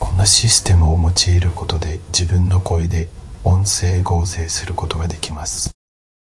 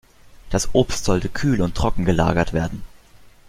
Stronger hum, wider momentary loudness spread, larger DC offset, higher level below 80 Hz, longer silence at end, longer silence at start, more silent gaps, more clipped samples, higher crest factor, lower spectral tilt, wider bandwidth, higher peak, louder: neither; first, 11 LU vs 7 LU; neither; about the same, -28 dBFS vs -32 dBFS; about the same, 0.55 s vs 0.6 s; second, 0 s vs 0.25 s; neither; neither; about the same, 16 dB vs 18 dB; second, -3.5 dB/octave vs -5.5 dB/octave; second, 12 kHz vs 15.5 kHz; about the same, 0 dBFS vs -2 dBFS; first, -17 LUFS vs -21 LUFS